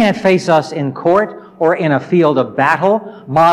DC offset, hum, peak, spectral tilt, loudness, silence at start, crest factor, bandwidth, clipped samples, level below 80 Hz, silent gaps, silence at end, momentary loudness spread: under 0.1%; none; -2 dBFS; -6.5 dB/octave; -14 LUFS; 0 s; 12 dB; 14.5 kHz; under 0.1%; -56 dBFS; none; 0 s; 6 LU